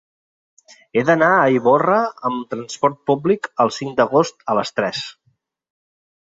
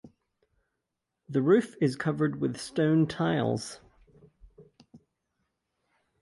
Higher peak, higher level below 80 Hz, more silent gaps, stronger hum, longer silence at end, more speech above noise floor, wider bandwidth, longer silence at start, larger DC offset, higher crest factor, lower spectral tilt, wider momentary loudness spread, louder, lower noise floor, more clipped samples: first, -2 dBFS vs -10 dBFS; about the same, -64 dBFS vs -64 dBFS; neither; neither; second, 1.1 s vs 1.25 s; second, 48 dB vs 58 dB; second, 7.8 kHz vs 11.5 kHz; first, 0.95 s vs 0.05 s; neither; about the same, 18 dB vs 20 dB; second, -5.5 dB/octave vs -7 dB/octave; about the same, 10 LU vs 9 LU; first, -18 LUFS vs -28 LUFS; second, -65 dBFS vs -84 dBFS; neither